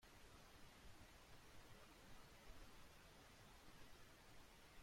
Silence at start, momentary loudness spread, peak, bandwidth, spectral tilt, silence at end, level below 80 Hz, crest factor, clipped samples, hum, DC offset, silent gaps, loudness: 0 s; 1 LU; -48 dBFS; 16.5 kHz; -3.5 dB/octave; 0 s; -70 dBFS; 14 dB; under 0.1%; none; under 0.1%; none; -66 LUFS